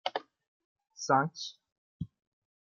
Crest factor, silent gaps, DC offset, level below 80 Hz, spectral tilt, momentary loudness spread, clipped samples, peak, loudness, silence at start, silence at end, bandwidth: 24 dB; 0.47-0.76 s, 1.72-2.00 s; under 0.1%; -70 dBFS; -4 dB/octave; 17 LU; under 0.1%; -12 dBFS; -32 LUFS; 0.05 s; 0.6 s; 7.4 kHz